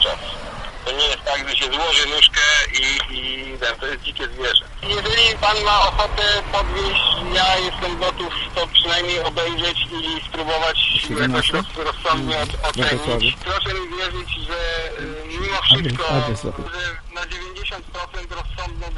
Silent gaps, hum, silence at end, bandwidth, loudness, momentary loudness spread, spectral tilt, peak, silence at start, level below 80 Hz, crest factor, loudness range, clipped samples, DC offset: none; none; 0 s; 11.5 kHz; -18 LUFS; 14 LU; -2.5 dB/octave; 0 dBFS; 0 s; -32 dBFS; 20 dB; 5 LU; under 0.1%; under 0.1%